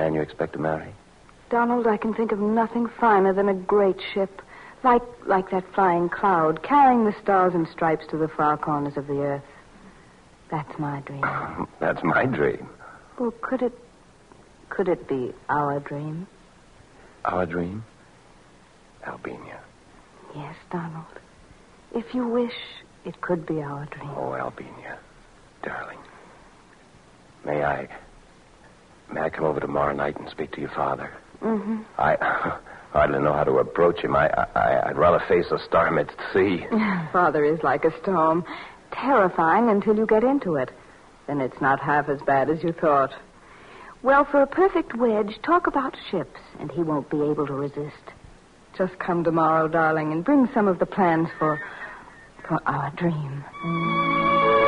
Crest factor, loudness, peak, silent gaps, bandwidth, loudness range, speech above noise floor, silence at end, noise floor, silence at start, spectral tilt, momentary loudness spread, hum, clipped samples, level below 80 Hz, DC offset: 18 dB; -23 LUFS; -6 dBFS; none; 10.5 kHz; 12 LU; 30 dB; 0 s; -53 dBFS; 0 s; -8 dB/octave; 17 LU; none; under 0.1%; -52 dBFS; under 0.1%